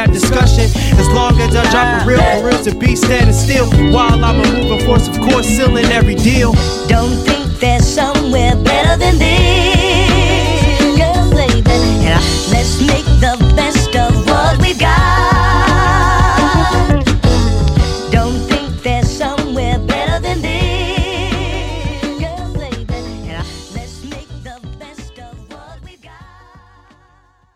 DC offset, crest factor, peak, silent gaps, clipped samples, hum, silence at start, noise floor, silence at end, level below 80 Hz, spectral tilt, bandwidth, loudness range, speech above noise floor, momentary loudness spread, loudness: under 0.1%; 12 dB; 0 dBFS; none; under 0.1%; none; 0 s; -51 dBFS; 1.7 s; -18 dBFS; -5 dB/octave; 15 kHz; 12 LU; 41 dB; 12 LU; -12 LUFS